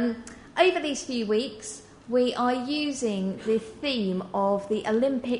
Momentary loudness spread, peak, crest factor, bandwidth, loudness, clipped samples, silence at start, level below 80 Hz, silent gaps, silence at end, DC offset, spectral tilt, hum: 11 LU; -8 dBFS; 20 dB; 10.5 kHz; -27 LUFS; under 0.1%; 0 s; -60 dBFS; none; 0 s; under 0.1%; -4.5 dB/octave; none